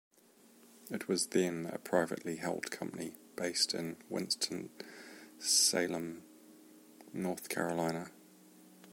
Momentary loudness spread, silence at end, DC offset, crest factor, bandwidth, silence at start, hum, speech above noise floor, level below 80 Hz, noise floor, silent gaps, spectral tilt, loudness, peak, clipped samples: 19 LU; 0 s; under 0.1%; 22 dB; 16.5 kHz; 0.65 s; none; 28 dB; -78 dBFS; -64 dBFS; none; -2.5 dB/octave; -35 LUFS; -14 dBFS; under 0.1%